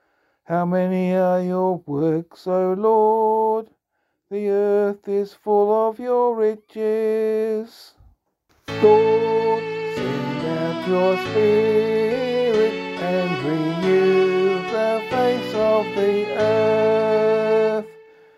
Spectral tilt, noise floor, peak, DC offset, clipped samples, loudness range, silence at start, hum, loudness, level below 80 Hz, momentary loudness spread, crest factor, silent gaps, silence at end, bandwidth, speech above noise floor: -7 dB/octave; -73 dBFS; -4 dBFS; under 0.1%; under 0.1%; 2 LU; 0.5 s; none; -20 LUFS; -62 dBFS; 8 LU; 16 dB; none; 0.45 s; 12.5 kHz; 55 dB